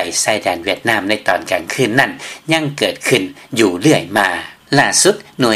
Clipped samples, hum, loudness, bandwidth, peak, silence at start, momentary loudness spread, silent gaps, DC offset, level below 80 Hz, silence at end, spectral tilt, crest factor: under 0.1%; none; -15 LUFS; 16.5 kHz; 0 dBFS; 0 s; 6 LU; none; under 0.1%; -56 dBFS; 0 s; -3 dB/octave; 16 dB